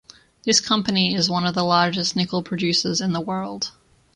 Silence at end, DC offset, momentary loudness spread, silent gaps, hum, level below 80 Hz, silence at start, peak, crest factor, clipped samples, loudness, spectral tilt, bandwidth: 0.45 s; under 0.1%; 10 LU; none; none; -58 dBFS; 0.45 s; -4 dBFS; 20 dB; under 0.1%; -21 LUFS; -3.5 dB/octave; 11 kHz